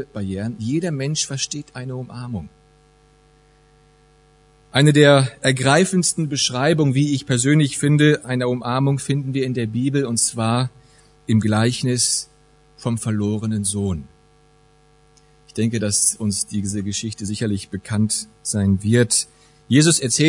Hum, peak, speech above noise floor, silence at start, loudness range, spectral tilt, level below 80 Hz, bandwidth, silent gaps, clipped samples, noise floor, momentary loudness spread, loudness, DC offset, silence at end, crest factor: none; 0 dBFS; 35 dB; 0 s; 9 LU; -4.5 dB/octave; -56 dBFS; 11 kHz; none; under 0.1%; -54 dBFS; 12 LU; -19 LUFS; under 0.1%; 0 s; 20 dB